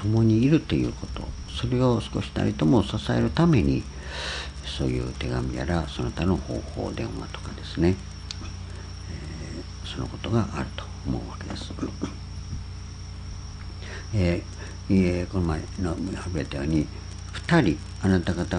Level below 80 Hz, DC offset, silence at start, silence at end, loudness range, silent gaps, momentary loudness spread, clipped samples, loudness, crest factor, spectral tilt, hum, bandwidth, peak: -38 dBFS; under 0.1%; 0 s; 0 s; 8 LU; none; 16 LU; under 0.1%; -27 LUFS; 20 dB; -6.5 dB/octave; none; 10.5 kHz; -6 dBFS